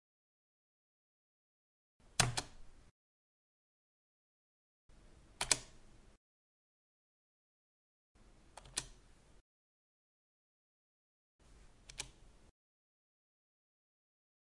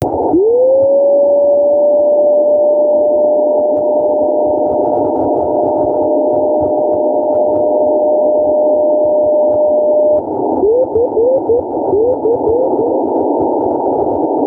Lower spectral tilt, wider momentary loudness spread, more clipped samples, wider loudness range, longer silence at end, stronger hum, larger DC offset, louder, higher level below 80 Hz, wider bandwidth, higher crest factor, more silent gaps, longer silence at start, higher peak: second, -1.5 dB/octave vs -11 dB/octave; first, 25 LU vs 4 LU; neither; first, 14 LU vs 3 LU; first, 2.2 s vs 0 s; neither; neither; second, -38 LUFS vs -12 LUFS; second, -64 dBFS vs -46 dBFS; first, 11.5 kHz vs 1.5 kHz; first, 38 dB vs 8 dB; first, 2.91-4.89 s, 6.17-8.15 s, 9.41-11.39 s vs none; first, 2.2 s vs 0 s; second, -10 dBFS vs -4 dBFS